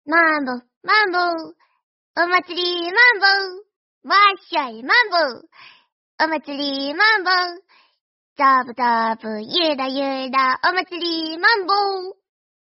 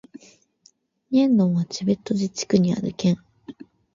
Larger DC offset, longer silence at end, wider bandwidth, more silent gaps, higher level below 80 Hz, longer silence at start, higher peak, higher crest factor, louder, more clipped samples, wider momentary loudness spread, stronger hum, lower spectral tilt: neither; first, 0.6 s vs 0.3 s; second, 6 kHz vs 7.6 kHz; first, 0.76-0.81 s, 1.83-2.14 s, 3.76-4.01 s, 5.92-6.18 s, 8.01-8.36 s vs none; second, -74 dBFS vs -60 dBFS; second, 0.05 s vs 1.1 s; first, -2 dBFS vs -6 dBFS; about the same, 18 dB vs 18 dB; first, -18 LUFS vs -22 LUFS; neither; about the same, 10 LU vs 9 LU; neither; second, 2 dB/octave vs -6.5 dB/octave